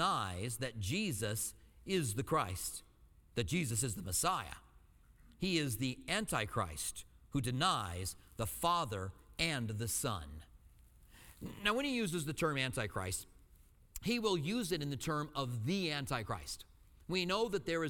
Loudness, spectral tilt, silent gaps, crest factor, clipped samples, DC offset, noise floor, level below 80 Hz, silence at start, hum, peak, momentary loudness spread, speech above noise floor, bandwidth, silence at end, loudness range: -37 LUFS; -4 dB/octave; none; 22 dB; under 0.1%; under 0.1%; -64 dBFS; -58 dBFS; 0 s; none; -18 dBFS; 10 LU; 26 dB; 19.5 kHz; 0 s; 2 LU